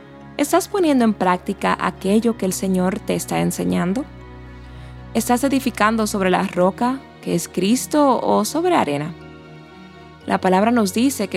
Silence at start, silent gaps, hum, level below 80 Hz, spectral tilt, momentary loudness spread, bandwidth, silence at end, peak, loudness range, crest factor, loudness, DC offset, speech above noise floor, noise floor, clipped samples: 0 s; none; none; -46 dBFS; -5 dB/octave; 18 LU; 16.5 kHz; 0 s; 0 dBFS; 3 LU; 18 dB; -19 LUFS; under 0.1%; 23 dB; -41 dBFS; under 0.1%